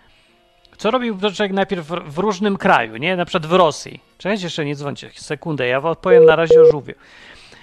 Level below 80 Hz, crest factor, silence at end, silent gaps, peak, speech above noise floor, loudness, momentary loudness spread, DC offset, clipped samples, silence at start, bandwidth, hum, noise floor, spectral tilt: -52 dBFS; 18 dB; 0.7 s; none; 0 dBFS; 38 dB; -16 LUFS; 17 LU; under 0.1%; under 0.1%; 0.8 s; 10 kHz; none; -55 dBFS; -5.5 dB/octave